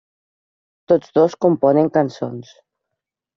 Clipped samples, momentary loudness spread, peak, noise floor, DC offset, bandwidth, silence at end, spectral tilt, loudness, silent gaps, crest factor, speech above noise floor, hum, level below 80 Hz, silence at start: under 0.1%; 14 LU; -2 dBFS; -82 dBFS; under 0.1%; 7.2 kHz; 0.95 s; -7.5 dB/octave; -17 LUFS; none; 16 dB; 65 dB; none; -64 dBFS; 0.9 s